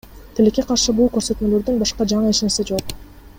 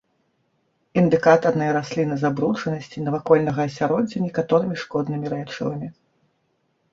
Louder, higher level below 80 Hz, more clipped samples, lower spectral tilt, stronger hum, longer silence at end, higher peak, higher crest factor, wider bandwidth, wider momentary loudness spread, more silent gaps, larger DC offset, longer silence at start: first, -18 LUFS vs -22 LUFS; first, -38 dBFS vs -60 dBFS; neither; second, -4.5 dB/octave vs -7.5 dB/octave; neither; second, 0.1 s vs 1 s; about the same, -4 dBFS vs -2 dBFS; second, 14 dB vs 20 dB; first, 16.5 kHz vs 7.6 kHz; second, 8 LU vs 11 LU; neither; neither; second, 0.05 s vs 0.95 s